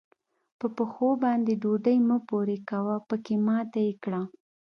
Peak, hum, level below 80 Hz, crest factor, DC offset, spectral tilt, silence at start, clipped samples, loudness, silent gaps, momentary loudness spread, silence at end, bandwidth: -12 dBFS; none; -78 dBFS; 14 dB; under 0.1%; -9 dB/octave; 0.6 s; under 0.1%; -27 LUFS; none; 9 LU; 0.4 s; 6.2 kHz